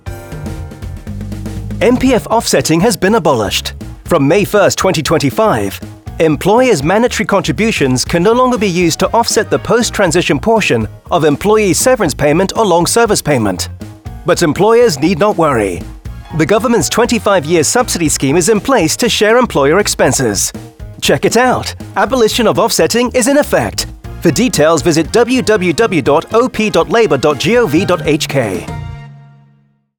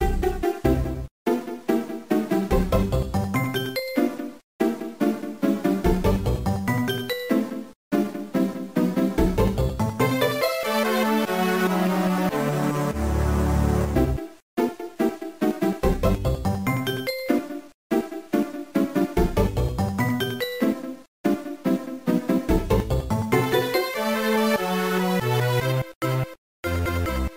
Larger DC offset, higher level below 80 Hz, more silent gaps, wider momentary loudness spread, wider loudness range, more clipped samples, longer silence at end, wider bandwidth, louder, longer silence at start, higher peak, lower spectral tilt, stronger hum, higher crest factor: second, under 0.1% vs 0.2%; about the same, -34 dBFS vs -32 dBFS; second, none vs 1.11-1.25 s, 4.44-4.59 s, 7.75-7.91 s, 14.42-14.57 s, 17.74-17.90 s, 21.08-21.24 s, 25.95-26.01 s, 26.38-26.63 s; first, 13 LU vs 5 LU; about the same, 2 LU vs 3 LU; neither; first, 0.75 s vs 0 s; first, over 20 kHz vs 16 kHz; first, -11 LUFS vs -24 LUFS; about the same, 0.05 s vs 0 s; first, 0 dBFS vs -6 dBFS; second, -4.5 dB/octave vs -6.5 dB/octave; neither; second, 10 dB vs 16 dB